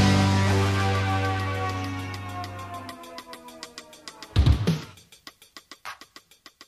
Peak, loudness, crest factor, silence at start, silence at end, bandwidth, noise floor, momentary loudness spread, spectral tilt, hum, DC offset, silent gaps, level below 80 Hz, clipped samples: -8 dBFS; -25 LUFS; 20 dB; 0 s; 0.05 s; 13.5 kHz; -52 dBFS; 22 LU; -5.5 dB/octave; none; under 0.1%; none; -36 dBFS; under 0.1%